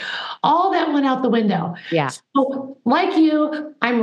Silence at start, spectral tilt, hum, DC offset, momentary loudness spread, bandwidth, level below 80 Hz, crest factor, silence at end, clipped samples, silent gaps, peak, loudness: 0 s; -6 dB/octave; none; under 0.1%; 7 LU; 10.5 kHz; -84 dBFS; 18 dB; 0 s; under 0.1%; none; 0 dBFS; -19 LUFS